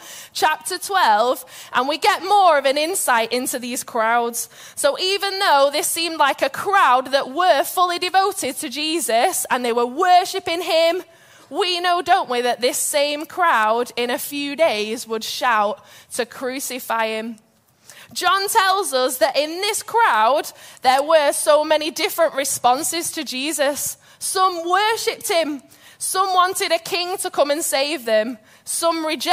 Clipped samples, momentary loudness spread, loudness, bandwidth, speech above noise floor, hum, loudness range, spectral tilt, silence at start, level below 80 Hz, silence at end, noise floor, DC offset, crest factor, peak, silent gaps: under 0.1%; 9 LU; -19 LUFS; 16 kHz; 31 dB; none; 4 LU; -0.5 dB/octave; 0 s; -70 dBFS; 0 s; -50 dBFS; under 0.1%; 16 dB; -4 dBFS; none